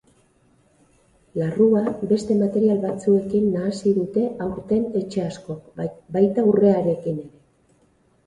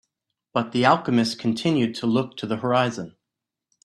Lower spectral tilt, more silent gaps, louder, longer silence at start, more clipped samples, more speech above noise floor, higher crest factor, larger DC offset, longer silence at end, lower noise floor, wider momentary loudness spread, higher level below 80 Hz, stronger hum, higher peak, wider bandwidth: first, -8.5 dB/octave vs -6 dB/octave; neither; about the same, -21 LUFS vs -23 LUFS; first, 1.35 s vs 0.55 s; neither; second, 40 dB vs 63 dB; about the same, 18 dB vs 20 dB; neither; first, 1 s vs 0.75 s; second, -61 dBFS vs -85 dBFS; first, 13 LU vs 9 LU; first, -56 dBFS vs -64 dBFS; neither; about the same, -4 dBFS vs -4 dBFS; second, 10.5 kHz vs 12 kHz